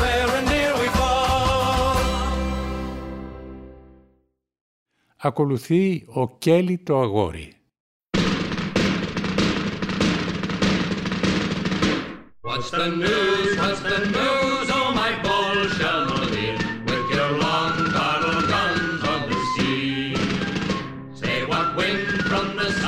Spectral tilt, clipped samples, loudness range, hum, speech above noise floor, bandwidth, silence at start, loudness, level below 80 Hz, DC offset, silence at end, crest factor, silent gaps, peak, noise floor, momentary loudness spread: -5 dB/octave; under 0.1%; 5 LU; none; 45 dB; 16 kHz; 0 s; -22 LUFS; -38 dBFS; under 0.1%; 0 s; 16 dB; 4.61-4.86 s, 7.80-8.00 s; -6 dBFS; -66 dBFS; 8 LU